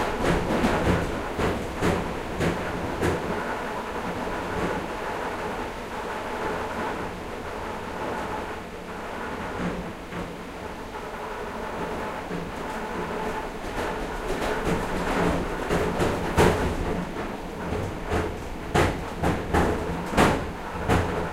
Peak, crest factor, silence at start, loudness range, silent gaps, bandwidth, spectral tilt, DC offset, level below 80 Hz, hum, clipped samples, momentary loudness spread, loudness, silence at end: -6 dBFS; 22 dB; 0 s; 7 LU; none; 16 kHz; -5.5 dB/octave; under 0.1%; -38 dBFS; none; under 0.1%; 10 LU; -28 LUFS; 0 s